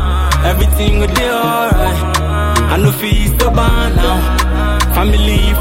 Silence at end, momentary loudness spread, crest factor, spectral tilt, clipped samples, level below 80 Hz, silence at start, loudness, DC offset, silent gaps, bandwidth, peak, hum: 0 s; 2 LU; 10 dB; -5 dB/octave; under 0.1%; -14 dBFS; 0 s; -13 LUFS; under 0.1%; none; 17 kHz; 0 dBFS; none